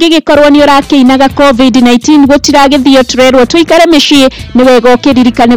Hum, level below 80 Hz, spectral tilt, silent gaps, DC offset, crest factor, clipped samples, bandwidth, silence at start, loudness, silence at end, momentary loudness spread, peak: none; -30 dBFS; -4 dB/octave; none; 4%; 4 dB; 10%; 17.5 kHz; 0 s; -4 LUFS; 0 s; 2 LU; 0 dBFS